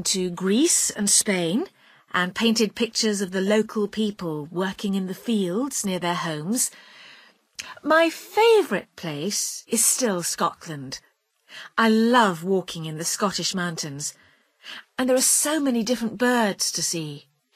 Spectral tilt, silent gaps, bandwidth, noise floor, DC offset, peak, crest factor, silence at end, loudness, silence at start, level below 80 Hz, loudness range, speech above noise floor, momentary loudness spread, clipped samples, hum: -3 dB/octave; none; 15.5 kHz; -55 dBFS; under 0.1%; -4 dBFS; 20 dB; 0.35 s; -22 LUFS; 0 s; -66 dBFS; 4 LU; 32 dB; 15 LU; under 0.1%; none